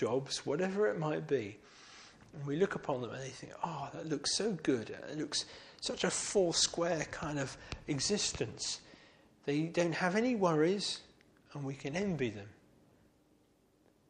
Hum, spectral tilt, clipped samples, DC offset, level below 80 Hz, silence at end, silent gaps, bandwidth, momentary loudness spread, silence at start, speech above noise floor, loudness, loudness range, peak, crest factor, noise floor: none; -4 dB/octave; under 0.1%; under 0.1%; -64 dBFS; 1.6 s; none; 11.5 kHz; 15 LU; 0 s; 35 dB; -35 LUFS; 4 LU; -16 dBFS; 20 dB; -70 dBFS